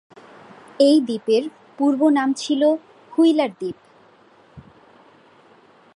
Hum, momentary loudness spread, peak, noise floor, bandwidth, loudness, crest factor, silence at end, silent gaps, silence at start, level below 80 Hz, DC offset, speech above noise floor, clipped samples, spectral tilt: none; 15 LU; -4 dBFS; -52 dBFS; 11.5 kHz; -19 LUFS; 18 dB; 1.35 s; none; 0.8 s; -68 dBFS; under 0.1%; 34 dB; under 0.1%; -4.5 dB/octave